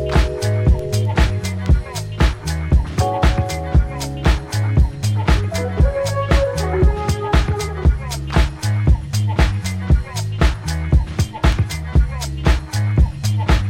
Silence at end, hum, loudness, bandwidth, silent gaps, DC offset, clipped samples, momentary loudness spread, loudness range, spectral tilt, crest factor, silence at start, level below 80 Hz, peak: 0 s; none; -19 LUFS; 15.5 kHz; none; under 0.1%; under 0.1%; 4 LU; 1 LU; -6 dB/octave; 14 dB; 0 s; -20 dBFS; -2 dBFS